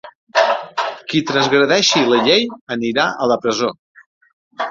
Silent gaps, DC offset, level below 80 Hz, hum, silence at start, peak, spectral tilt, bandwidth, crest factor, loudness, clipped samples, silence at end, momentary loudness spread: 0.15-0.27 s, 2.61-2.67 s, 3.79-3.95 s, 4.06-4.21 s, 4.33-4.51 s; under 0.1%; -58 dBFS; none; 0.05 s; -2 dBFS; -3.5 dB/octave; 7.6 kHz; 16 dB; -16 LUFS; under 0.1%; 0 s; 10 LU